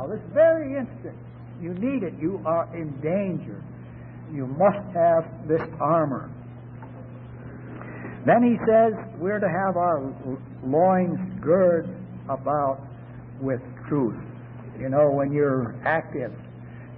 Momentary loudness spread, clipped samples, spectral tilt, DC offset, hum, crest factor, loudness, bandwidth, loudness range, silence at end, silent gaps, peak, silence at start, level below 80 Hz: 21 LU; under 0.1%; -12.5 dB/octave; under 0.1%; none; 18 dB; -24 LUFS; 3.8 kHz; 6 LU; 0 s; none; -8 dBFS; 0 s; -54 dBFS